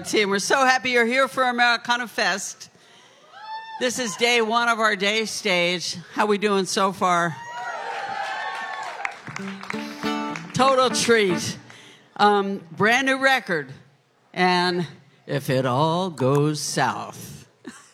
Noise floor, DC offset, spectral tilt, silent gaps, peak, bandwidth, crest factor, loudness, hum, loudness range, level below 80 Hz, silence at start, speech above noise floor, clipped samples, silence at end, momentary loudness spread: -59 dBFS; under 0.1%; -3.5 dB/octave; none; -4 dBFS; 16.5 kHz; 20 dB; -22 LUFS; none; 4 LU; -70 dBFS; 0 s; 37 dB; under 0.1%; 0.15 s; 15 LU